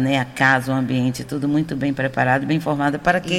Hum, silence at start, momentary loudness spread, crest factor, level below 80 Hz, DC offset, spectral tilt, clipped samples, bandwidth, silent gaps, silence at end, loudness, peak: none; 0 s; 5 LU; 16 dB; -48 dBFS; under 0.1%; -6 dB/octave; under 0.1%; 15.5 kHz; none; 0 s; -20 LUFS; -4 dBFS